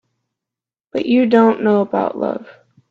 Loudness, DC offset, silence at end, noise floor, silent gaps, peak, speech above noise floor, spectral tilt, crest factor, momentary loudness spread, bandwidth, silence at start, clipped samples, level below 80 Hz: -16 LUFS; under 0.1%; 0.4 s; -87 dBFS; none; 0 dBFS; 72 dB; -8 dB/octave; 18 dB; 12 LU; 6 kHz; 0.95 s; under 0.1%; -64 dBFS